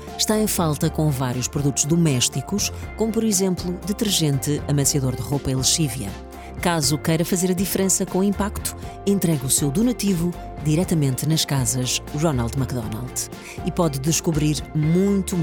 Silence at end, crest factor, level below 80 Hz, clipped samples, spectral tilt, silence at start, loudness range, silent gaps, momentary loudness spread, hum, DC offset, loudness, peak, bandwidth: 0 s; 18 dB; -40 dBFS; under 0.1%; -4.5 dB/octave; 0 s; 2 LU; none; 8 LU; none; under 0.1%; -21 LUFS; -4 dBFS; over 20 kHz